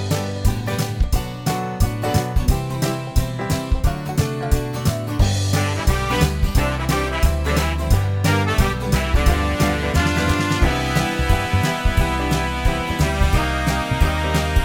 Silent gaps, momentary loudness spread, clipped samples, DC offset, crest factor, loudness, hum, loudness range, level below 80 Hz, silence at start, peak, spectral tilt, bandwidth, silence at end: none; 4 LU; under 0.1%; under 0.1%; 16 dB; -20 LUFS; none; 3 LU; -22 dBFS; 0 s; -4 dBFS; -5.5 dB/octave; 17.5 kHz; 0 s